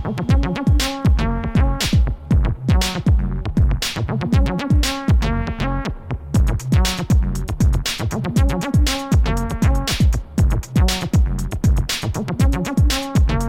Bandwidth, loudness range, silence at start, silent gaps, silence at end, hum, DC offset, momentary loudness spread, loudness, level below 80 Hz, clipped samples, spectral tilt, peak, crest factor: 16.5 kHz; 1 LU; 0 s; none; 0 s; none; under 0.1%; 4 LU; -19 LUFS; -20 dBFS; under 0.1%; -5.5 dB/octave; -4 dBFS; 14 dB